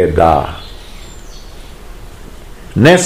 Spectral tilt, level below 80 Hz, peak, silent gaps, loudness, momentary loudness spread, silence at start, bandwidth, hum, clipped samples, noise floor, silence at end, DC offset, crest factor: -5.5 dB/octave; -30 dBFS; 0 dBFS; none; -12 LUFS; 25 LU; 0 s; 17.5 kHz; none; 1%; -32 dBFS; 0 s; 1%; 14 dB